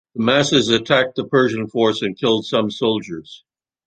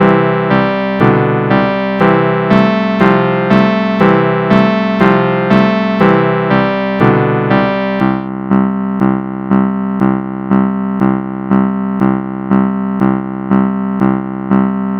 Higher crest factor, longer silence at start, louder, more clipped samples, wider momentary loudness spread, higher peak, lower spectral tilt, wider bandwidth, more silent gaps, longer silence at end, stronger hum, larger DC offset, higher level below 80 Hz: first, 18 dB vs 12 dB; first, 0.15 s vs 0 s; second, -18 LUFS vs -12 LUFS; second, under 0.1% vs 0.4%; about the same, 6 LU vs 4 LU; about the same, -2 dBFS vs 0 dBFS; second, -4.5 dB/octave vs -9 dB/octave; first, 9.2 kHz vs 6 kHz; neither; first, 0.5 s vs 0 s; neither; neither; second, -56 dBFS vs -40 dBFS